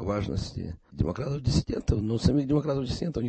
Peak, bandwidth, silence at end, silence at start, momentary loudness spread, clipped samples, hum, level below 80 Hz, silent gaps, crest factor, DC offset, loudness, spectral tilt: -10 dBFS; 8.8 kHz; 0 s; 0 s; 8 LU; under 0.1%; none; -38 dBFS; none; 18 dB; under 0.1%; -28 LUFS; -7 dB/octave